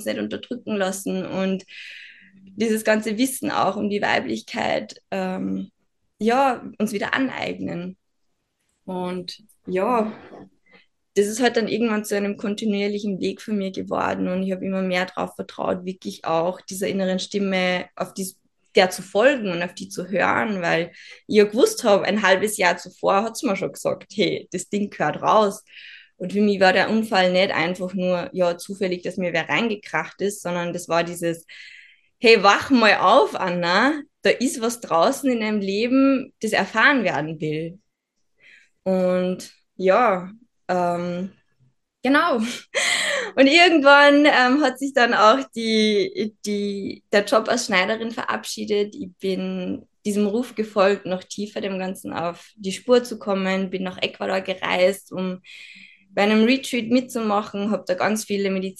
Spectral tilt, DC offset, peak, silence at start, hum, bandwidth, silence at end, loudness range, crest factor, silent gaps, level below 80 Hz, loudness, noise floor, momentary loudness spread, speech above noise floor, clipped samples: -4.5 dB/octave; under 0.1%; -2 dBFS; 0 s; none; 12.5 kHz; 0.1 s; 8 LU; 20 dB; none; -68 dBFS; -21 LUFS; -74 dBFS; 13 LU; 53 dB; under 0.1%